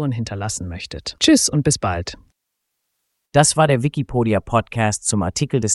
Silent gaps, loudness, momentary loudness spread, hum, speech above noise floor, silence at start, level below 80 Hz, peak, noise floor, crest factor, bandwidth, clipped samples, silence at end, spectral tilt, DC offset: none; -19 LUFS; 13 LU; none; 58 dB; 0 s; -42 dBFS; -2 dBFS; -77 dBFS; 18 dB; 12 kHz; under 0.1%; 0 s; -4.5 dB/octave; under 0.1%